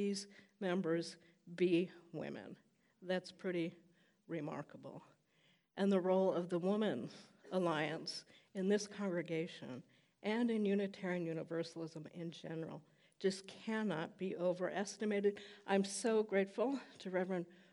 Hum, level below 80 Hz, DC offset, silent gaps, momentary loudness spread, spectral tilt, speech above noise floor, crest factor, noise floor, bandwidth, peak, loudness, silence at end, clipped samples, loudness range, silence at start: none; under -90 dBFS; under 0.1%; none; 16 LU; -5.5 dB/octave; 35 dB; 20 dB; -75 dBFS; 11.5 kHz; -20 dBFS; -40 LUFS; 0.2 s; under 0.1%; 5 LU; 0 s